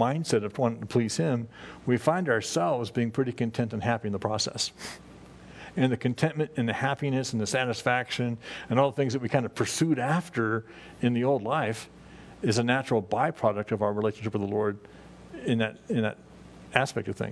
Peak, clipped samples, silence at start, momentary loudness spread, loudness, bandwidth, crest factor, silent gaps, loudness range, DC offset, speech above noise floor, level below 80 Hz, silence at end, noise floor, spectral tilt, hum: -4 dBFS; under 0.1%; 0 s; 10 LU; -28 LUFS; 11 kHz; 24 dB; none; 3 LU; under 0.1%; 20 dB; -62 dBFS; 0 s; -48 dBFS; -5.5 dB/octave; none